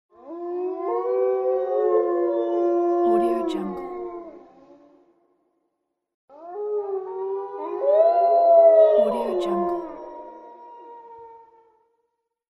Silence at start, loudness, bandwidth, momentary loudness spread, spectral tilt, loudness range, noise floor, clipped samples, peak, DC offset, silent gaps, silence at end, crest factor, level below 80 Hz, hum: 0.25 s; -21 LUFS; 5.6 kHz; 23 LU; -7.5 dB/octave; 15 LU; -77 dBFS; under 0.1%; -6 dBFS; under 0.1%; 6.14-6.28 s; 1.15 s; 18 dB; -64 dBFS; none